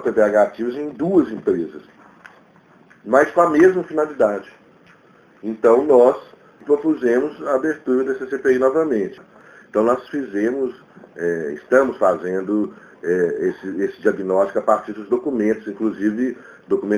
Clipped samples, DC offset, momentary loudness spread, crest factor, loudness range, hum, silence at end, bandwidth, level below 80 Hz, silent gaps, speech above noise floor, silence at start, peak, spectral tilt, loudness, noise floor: under 0.1%; under 0.1%; 11 LU; 18 dB; 3 LU; none; 0 s; 10.5 kHz; -60 dBFS; none; 32 dB; 0 s; 0 dBFS; -7 dB/octave; -19 LUFS; -51 dBFS